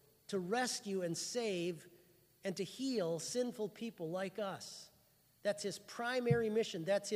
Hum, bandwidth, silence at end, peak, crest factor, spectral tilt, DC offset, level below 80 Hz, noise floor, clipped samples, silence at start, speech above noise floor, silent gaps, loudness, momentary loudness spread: none; 15.5 kHz; 0 s; -20 dBFS; 18 dB; -4.5 dB/octave; under 0.1%; -78 dBFS; -71 dBFS; under 0.1%; 0.3 s; 32 dB; none; -39 LUFS; 10 LU